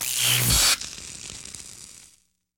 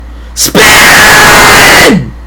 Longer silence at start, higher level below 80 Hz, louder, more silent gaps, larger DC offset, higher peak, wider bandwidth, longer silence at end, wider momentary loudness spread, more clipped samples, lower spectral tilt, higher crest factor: about the same, 0 s vs 0 s; second, -40 dBFS vs -22 dBFS; second, -19 LUFS vs 0 LUFS; neither; neither; second, -8 dBFS vs 0 dBFS; about the same, 19.5 kHz vs over 20 kHz; first, 0.6 s vs 0 s; first, 22 LU vs 8 LU; second, under 0.1% vs 20%; about the same, -1 dB/octave vs -2 dB/octave; first, 18 dB vs 4 dB